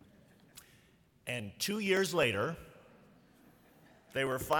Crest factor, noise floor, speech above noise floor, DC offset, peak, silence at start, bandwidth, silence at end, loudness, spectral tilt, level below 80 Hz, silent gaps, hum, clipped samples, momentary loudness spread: 22 dB; -66 dBFS; 33 dB; under 0.1%; -16 dBFS; 0.55 s; 19 kHz; 0 s; -34 LUFS; -4 dB/octave; -66 dBFS; none; none; under 0.1%; 26 LU